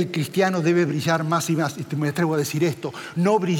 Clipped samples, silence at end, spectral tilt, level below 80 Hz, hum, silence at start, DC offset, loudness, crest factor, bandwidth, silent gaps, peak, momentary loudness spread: under 0.1%; 0 s; -6 dB/octave; -72 dBFS; none; 0 s; under 0.1%; -22 LUFS; 14 dB; 17 kHz; none; -8 dBFS; 6 LU